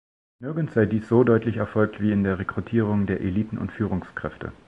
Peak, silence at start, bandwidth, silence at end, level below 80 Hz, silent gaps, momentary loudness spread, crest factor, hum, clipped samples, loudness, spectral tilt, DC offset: -6 dBFS; 0.4 s; 4.9 kHz; 0.15 s; -46 dBFS; none; 12 LU; 18 dB; none; under 0.1%; -24 LUFS; -10 dB/octave; under 0.1%